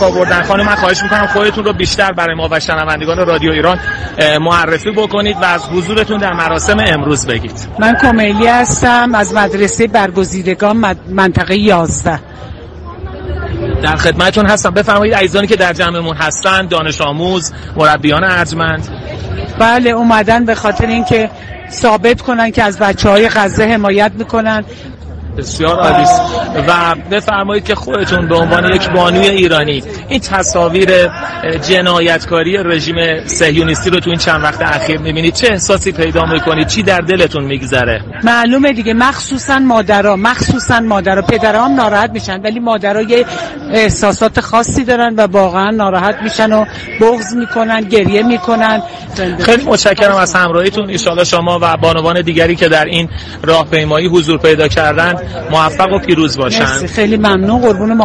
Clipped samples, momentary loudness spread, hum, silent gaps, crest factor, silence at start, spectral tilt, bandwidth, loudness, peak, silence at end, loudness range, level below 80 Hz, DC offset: under 0.1%; 7 LU; none; none; 10 dB; 0 s; -4.5 dB/octave; 11.5 kHz; -11 LUFS; 0 dBFS; 0 s; 2 LU; -30 dBFS; under 0.1%